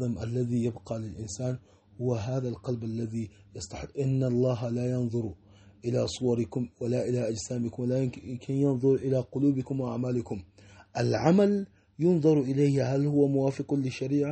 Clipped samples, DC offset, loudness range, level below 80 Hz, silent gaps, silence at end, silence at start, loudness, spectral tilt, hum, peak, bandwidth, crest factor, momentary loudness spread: under 0.1%; under 0.1%; 7 LU; -58 dBFS; none; 0 s; 0 s; -29 LUFS; -7.5 dB/octave; none; -10 dBFS; 8.4 kHz; 20 dB; 13 LU